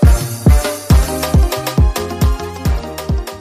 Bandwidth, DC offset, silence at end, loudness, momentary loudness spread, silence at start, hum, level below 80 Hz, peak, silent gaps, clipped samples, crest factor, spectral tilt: 15.5 kHz; under 0.1%; 0 s; -16 LUFS; 8 LU; 0 s; none; -16 dBFS; 0 dBFS; none; under 0.1%; 12 dB; -6 dB/octave